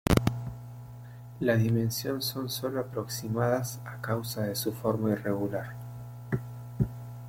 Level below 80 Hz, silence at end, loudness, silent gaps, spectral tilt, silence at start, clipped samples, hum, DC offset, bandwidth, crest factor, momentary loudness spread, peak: -46 dBFS; 0 s; -31 LUFS; none; -5.5 dB/octave; 0.05 s; under 0.1%; none; under 0.1%; 16.5 kHz; 24 dB; 16 LU; -8 dBFS